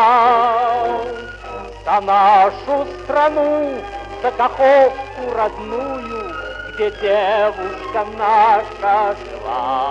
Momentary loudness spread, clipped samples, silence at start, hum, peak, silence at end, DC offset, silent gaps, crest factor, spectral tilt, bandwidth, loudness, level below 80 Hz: 15 LU; under 0.1%; 0 s; none; -2 dBFS; 0 s; under 0.1%; none; 14 dB; -5 dB/octave; 8.8 kHz; -17 LUFS; -42 dBFS